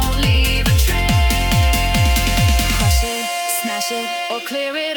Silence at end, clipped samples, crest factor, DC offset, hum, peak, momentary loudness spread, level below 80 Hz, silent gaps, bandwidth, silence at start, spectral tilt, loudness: 0 s; under 0.1%; 14 dB; under 0.1%; none; -2 dBFS; 6 LU; -20 dBFS; none; 19 kHz; 0 s; -4 dB/octave; -17 LUFS